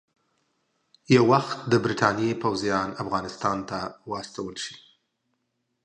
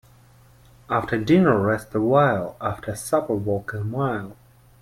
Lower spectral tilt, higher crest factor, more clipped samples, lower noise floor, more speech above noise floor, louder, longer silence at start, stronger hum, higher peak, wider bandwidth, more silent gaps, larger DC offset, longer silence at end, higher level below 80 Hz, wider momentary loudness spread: second, -5.5 dB/octave vs -7 dB/octave; about the same, 22 dB vs 18 dB; neither; first, -77 dBFS vs -52 dBFS; first, 52 dB vs 31 dB; second, -25 LUFS vs -22 LUFS; first, 1.1 s vs 0.9 s; neither; about the same, -6 dBFS vs -6 dBFS; second, 9.8 kHz vs 16 kHz; neither; neither; first, 1.05 s vs 0.5 s; second, -60 dBFS vs -52 dBFS; first, 14 LU vs 11 LU